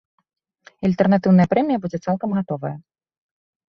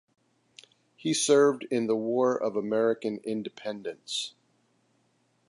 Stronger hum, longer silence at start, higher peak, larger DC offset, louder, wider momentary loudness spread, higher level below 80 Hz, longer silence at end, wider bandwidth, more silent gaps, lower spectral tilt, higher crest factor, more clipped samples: neither; second, 0.8 s vs 1.05 s; first, -4 dBFS vs -10 dBFS; neither; first, -20 LUFS vs -28 LUFS; about the same, 13 LU vs 14 LU; first, -56 dBFS vs -82 dBFS; second, 0.9 s vs 1.2 s; second, 6.4 kHz vs 11.5 kHz; neither; first, -9 dB/octave vs -3.5 dB/octave; about the same, 18 dB vs 18 dB; neither